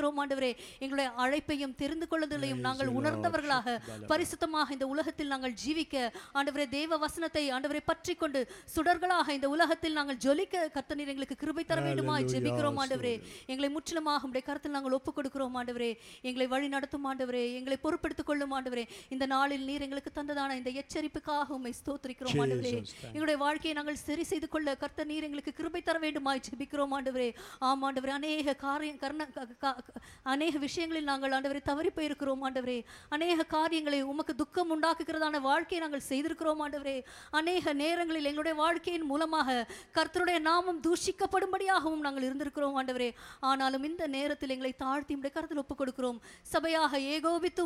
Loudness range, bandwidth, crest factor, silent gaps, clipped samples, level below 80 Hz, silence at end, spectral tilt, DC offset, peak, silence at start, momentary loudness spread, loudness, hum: 4 LU; 15.5 kHz; 18 dB; none; under 0.1%; -62 dBFS; 0 s; -4.5 dB/octave; under 0.1%; -14 dBFS; 0 s; 7 LU; -33 LUFS; none